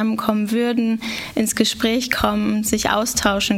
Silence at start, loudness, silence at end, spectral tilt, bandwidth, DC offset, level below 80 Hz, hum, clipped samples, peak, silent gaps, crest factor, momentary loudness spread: 0 s; -19 LUFS; 0 s; -3.5 dB/octave; 16.5 kHz; under 0.1%; -42 dBFS; none; under 0.1%; -2 dBFS; none; 18 dB; 4 LU